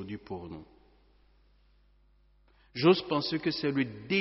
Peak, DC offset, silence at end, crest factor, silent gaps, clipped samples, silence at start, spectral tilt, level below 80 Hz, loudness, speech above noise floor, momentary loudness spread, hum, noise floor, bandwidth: -12 dBFS; under 0.1%; 0 s; 22 dB; none; under 0.1%; 0 s; -4 dB/octave; -64 dBFS; -30 LUFS; 35 dB; 18 LU; 50 Hz at -60 dBFS; -64 dBFS; 6 kHz